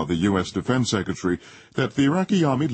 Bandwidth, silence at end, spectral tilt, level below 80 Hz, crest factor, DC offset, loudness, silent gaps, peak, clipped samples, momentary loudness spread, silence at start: 8.8 kHz; 0 s; -6 dB/octave; -50 dBFS; 14 dB; under 0.1%; -23 LUFS; none; -8 dBFS; under 0.1%; 6 LU; 0 s